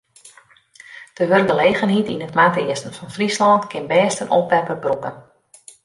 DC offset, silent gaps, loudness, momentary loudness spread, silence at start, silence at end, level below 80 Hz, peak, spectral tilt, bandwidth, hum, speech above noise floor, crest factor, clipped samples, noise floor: under 0.1%; none; -18 LUFS; 11 LU; 0.25 s; 0.65 s; -62 dBFS; -2 dBFS; -5 dB/octave; 11.5 kHz; none; 33 dB; 16 dB; under 0.1%; -50 dBFS